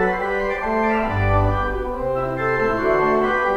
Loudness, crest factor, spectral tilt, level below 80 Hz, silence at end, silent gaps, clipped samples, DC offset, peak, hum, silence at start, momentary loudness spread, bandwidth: -20 LUFS; 14 dB; -8 dB/octave; -32 dBFS; 0 s; none; under 0.1%; under 0.1%; -6 dBFS; none; 0 s; 5 LU; 8.4 kHz